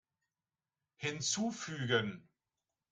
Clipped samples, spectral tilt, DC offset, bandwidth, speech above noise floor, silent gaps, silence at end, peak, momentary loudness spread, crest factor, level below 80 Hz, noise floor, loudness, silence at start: under 0.1%; -3 dB/octave; under 0.1%; 10 kHz; over 54 dB; none; 0.7 s; -18 dBFS; 9 LU; 22 dB; -76 dBFS; under -90 dBFS; -36 LUFS; 1 s